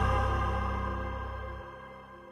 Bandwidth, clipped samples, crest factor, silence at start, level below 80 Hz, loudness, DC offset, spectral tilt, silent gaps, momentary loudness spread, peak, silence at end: 9.6 kHz; under 0.1%; 16 dB; 0 s; -36 dBFS; -33 LUFS; under 0.1%; -7 dB/octave; none; 18 LU; -16 dBFS; 0 s